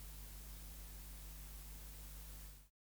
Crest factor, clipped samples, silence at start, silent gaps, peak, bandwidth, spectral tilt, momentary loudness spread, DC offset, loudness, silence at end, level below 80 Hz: 12 dB; under 0.1%; 0 s; none; -40 dBFS; over 20 kHz; -3 dB/octave; 2 LU; under 0.1%; -53 LUFS; 0.25 s; -54 dBFS